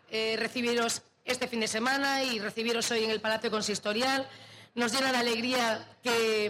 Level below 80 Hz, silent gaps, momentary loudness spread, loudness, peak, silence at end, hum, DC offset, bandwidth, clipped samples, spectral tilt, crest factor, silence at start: -78 dBFS; none; 6 LU; -29 LUFS; -16 dBFS; 0 s; none; under 0.1%; 16 kHz; under 0.1%; -2 dB/octave; 14 dB; 0.1 s